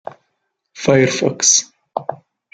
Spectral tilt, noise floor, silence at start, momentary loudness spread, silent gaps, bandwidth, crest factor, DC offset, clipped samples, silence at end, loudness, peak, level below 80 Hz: -3 dB/octave; -72 dBFS; 0.75 s; 17 LU; none; 10.5 kHz; 18 dB; under 0.1%; under 0.1%; 0.4 s; -15 LUFS; -2 dBFS; -58 dBFS